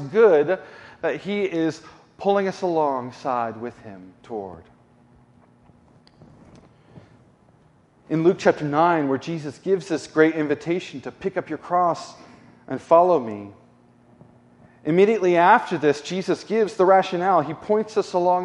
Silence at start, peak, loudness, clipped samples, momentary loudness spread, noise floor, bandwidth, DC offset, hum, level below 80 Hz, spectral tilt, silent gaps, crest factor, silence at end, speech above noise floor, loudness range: 0 s; -2 dBFS; -21 LUFS; under 0.1%; 17 LU; -57 dBFS; 11 kHz; under 0.1%; none; -66 dBFS; -6.5 dB/octave; none; 20 dB; 0 s; 36 dB; 13 LU